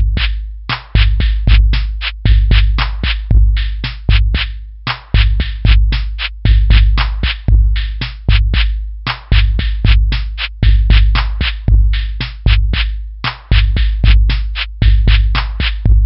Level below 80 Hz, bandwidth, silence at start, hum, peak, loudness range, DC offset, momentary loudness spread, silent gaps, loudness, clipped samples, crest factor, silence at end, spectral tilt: -12 dBFS; 5.8 kHz; 0 s; none; 0 dBFS; 1 LU; under 0.1%; 9 LU; none; -15 LUFS; under 0.1%; 10 dB; 0 s; -10 dB/octave